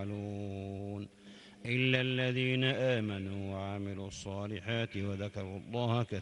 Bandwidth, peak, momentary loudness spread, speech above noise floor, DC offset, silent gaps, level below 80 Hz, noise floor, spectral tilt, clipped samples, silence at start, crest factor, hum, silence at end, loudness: 10.5 kHz; -14 dBFS; 13 LU; 21 dB; under 0.1%; none; -68 dBFS; -55 dBFS; -6 dB/octave; under 0.1%; 0 s; 20 dB; none; 0 s; -35 LUFS